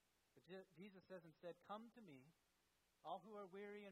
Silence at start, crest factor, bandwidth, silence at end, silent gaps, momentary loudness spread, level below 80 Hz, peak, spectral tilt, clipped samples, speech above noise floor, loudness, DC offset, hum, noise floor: 0.35 s; 20 dB; 11.5 kHz; 0 s; none; 9 LU; under -90 dBFS; -40 dBFS; -6 dB/octave; under 0.1%; 26 dB; -59 LUFS; under 0.1%; none; -85 dBFS